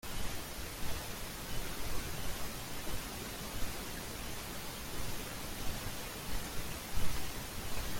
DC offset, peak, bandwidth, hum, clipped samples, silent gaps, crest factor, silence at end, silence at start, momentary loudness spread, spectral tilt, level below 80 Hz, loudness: under 0.1%; -18 dBFS; 17 kHz; none; under 0.1%; none; 18 dB; 0 s; 0.05 s; 2 LU; -3 dB/octave; -46 dBFS; -42 LUFS